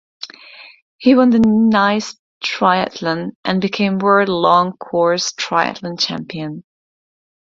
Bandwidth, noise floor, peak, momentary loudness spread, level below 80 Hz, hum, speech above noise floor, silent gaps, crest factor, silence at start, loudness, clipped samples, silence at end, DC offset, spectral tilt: 7.6 kHz; -41 dBFS; 0 dBFS; 15 LU; -54 dBFS; none; 25 dB; 0.82-0.99 s, 2.19-2.41 s, 3.35-3.43 s; 16 dB; 0.2 s; -16 LUFS; under 0.1%; 0.95 s; under 0.1%; -5 dB/octave